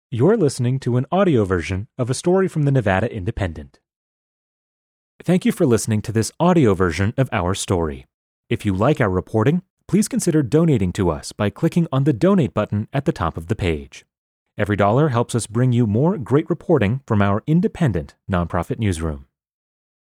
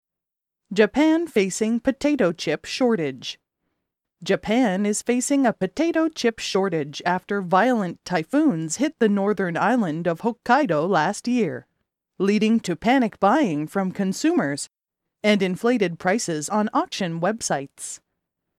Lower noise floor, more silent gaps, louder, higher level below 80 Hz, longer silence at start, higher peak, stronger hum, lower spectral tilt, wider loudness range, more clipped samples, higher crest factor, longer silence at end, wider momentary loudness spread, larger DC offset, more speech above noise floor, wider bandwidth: about the same, under -90 dBFS vs -87 dBFS; first, 3.96-5.19 s, 8.14-8.44 s, 9.70-9.77 s, 14.18-14.46 s vs none; about the same, -20 LUFS vs -22 LUFS; first, -44 dBFS vs -60 dBFS; second, 0.1 s vs 0.7 s; about the same, -4 dBFS vs -4 dBFS; neither; first, -6.5 dB/octave vs -5 dB/octave; about the same, 4 LU vs 2 LU; neither; about the same, 16 dB vs 18 dB; first, 0.95 s vs 0.65 s; about the same, 8 LU vs 7 LU; neither; first, over 71 dB vs 65 dB; about the same, 15.5 kHz vs 14.5 kHz